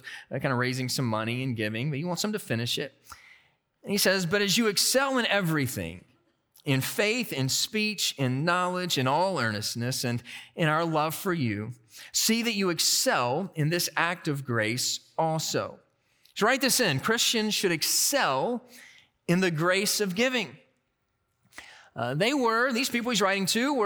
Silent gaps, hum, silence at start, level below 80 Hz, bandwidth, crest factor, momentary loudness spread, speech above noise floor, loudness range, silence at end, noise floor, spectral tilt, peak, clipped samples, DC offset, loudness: none; none; 0.05 s; -70 dBFS; over 20 kHz; 20 dB; 9 LU; 49 dB; 4 LU; 0 s; -76 dBFS; -3.5 dB/octave; -8 dBFS; under 0.1%; under 0.1%; -26 LUFS